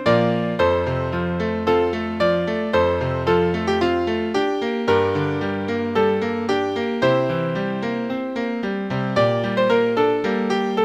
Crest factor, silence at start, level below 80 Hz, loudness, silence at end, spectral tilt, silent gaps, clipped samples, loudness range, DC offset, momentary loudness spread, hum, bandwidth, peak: 16 dB; 0 s; -46 dBFS; -21 LUFS; 0 s; -7 dB/octave; none; under 0.1%; 2 LU; under 0.1%; 5 LU; none; 9.2 kHz; -4 dBFS